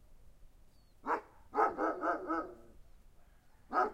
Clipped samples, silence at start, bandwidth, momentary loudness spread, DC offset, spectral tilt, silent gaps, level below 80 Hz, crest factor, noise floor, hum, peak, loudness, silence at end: under 0.1%; 0.1 s; 15.5 kHz; 14 LU; under 0.1%; -6 dB/octave; none; -62 dBFS; 22 dB; -61 dBFS; none; -16 dBFS; -36 LUFS; 0 s